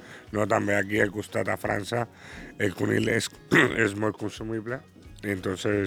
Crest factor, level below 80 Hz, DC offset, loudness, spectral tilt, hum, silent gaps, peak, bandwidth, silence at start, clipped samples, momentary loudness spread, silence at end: 20 dB; -54 dBFS; under 0.1%; -27 LUFS; -5 dB/octave; none; none; -8 dBFS; 17.5 kHz; 0 s; under 0.1%; 13 LU; 0 s